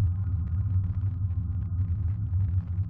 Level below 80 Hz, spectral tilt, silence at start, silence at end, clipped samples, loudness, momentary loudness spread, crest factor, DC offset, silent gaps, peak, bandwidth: -38 dBFS; -12.5 dB/octave; 0 s; 0 s; under 0.1%; -29 LUFS; 3 LU; 10 dB; under 0.1%; none; -18 dBFS; 1.8 kHz